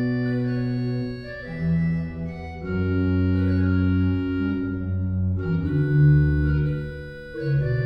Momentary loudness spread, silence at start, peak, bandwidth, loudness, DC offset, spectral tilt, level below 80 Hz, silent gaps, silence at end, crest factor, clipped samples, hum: 13 LU; 0 s; -8 dBFS; 5.4 kHz; -23 LUFS; under 0.1%; -10.5 dB/octave; -36 dBFS; none; 0 s; 14 dB; under 0.1%; none